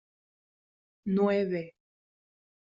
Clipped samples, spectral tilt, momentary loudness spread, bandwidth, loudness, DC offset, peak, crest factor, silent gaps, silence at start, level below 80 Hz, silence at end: under 0.1%; -7 dB/octave; 15 LU; 7.2 kHz; -29 LUFS; under 0.1%; -16 dBFS; 18 dB; none; 1.05 s; -72 dBFS; 1.05 s